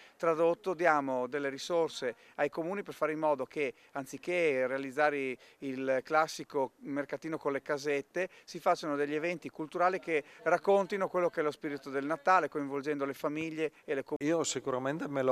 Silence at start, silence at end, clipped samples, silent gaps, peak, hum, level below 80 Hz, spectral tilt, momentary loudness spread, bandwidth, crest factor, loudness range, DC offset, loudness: 0 s; 0 s; under 0.1%; 14.16-14.20 s; -12 dBFS; none; -82 dBFS; -4.5 dB/octave; 9 LU; 15 kHz; 22 dB; 3 LU; under 0.1%; -33 LUFS